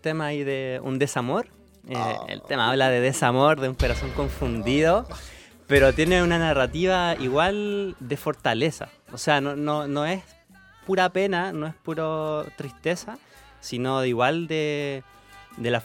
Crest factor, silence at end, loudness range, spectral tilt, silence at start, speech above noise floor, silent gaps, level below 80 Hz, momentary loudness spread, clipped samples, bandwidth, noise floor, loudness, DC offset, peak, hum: 20 dB; 0 s; 6 LU; -5 dB/octave; 0.05 s; 28 dB; none; -40 dBFS; 13 LU; under 0.1%; 17 kHz; -52 dBFS; -24 LUFS; under 0.1%; -4 dBFS; none